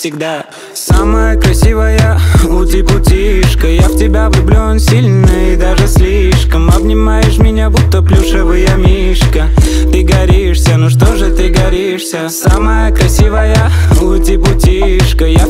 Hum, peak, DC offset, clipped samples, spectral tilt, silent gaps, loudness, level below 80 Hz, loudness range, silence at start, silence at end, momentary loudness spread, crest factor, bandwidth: none; 0 dBFS; under 0.1%; under 0.1%; -6 dB/octave; none; -9 LUFS; -10 dBFS; 1 LU; 0 s; 0 s; 3 LU; 8 dB; 16 kHz